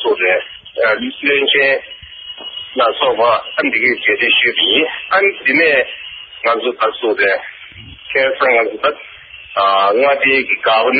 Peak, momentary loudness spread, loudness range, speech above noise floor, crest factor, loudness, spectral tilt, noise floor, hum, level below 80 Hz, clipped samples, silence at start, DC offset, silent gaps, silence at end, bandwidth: 0 dBFS; 18 LU; 4 LU; 22 dB; 14 dB; -13 LUFS; 1 dB/octave; -35 dBFS; none; -54 dBFS; under 0.1%; 0 s; under 0.1%; none; 0 s; 5 kHz